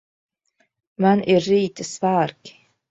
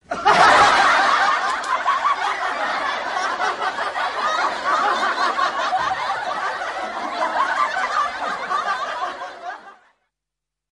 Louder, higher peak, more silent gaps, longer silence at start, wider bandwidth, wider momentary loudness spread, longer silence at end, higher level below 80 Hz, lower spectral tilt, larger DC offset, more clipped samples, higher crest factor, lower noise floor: about the same, -20 LUFS vs -19 LUFS; about the same, -4 dBFS vs -2 dBFS; neither; first, 1 s vs 0.1 s; second, 8 kHz vs 11.5 kHz; second, 8 LU vs 12 LU; second, 0.4 s vs 1 s; second, -62 dBFS vs -56 dBFS; first, -6 dB/octave vs -1.5 dB/octave; neither; neither; about the same, 18 dB vs 18 dB; second, -68 dBFS vs -85 dBFS